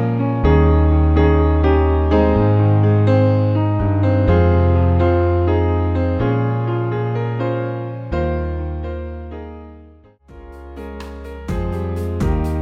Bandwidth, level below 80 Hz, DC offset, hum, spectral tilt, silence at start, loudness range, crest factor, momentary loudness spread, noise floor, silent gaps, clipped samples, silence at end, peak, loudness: 5.8 kHz; -24 dBFS; under 0.1%; none; -10 dB/octave; 0 s; 13 LU; 14 dB; 17 LU; -45 dBFS; none; under 0.1%; 0 s; -2 dBFS; -17 LUFS